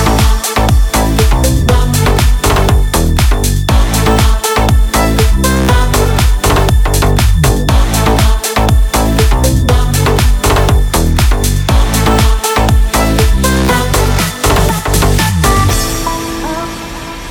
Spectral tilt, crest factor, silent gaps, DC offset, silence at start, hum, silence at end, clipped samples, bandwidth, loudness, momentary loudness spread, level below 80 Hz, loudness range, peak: -4.5 dB/octave; 10 dB; none; under 0.1%; 0 s; none; 0 s; under 0.1%; 18 kHz; -11 LUFS; 2 LU; -12 dBFS; 0 LU; 0 dBFS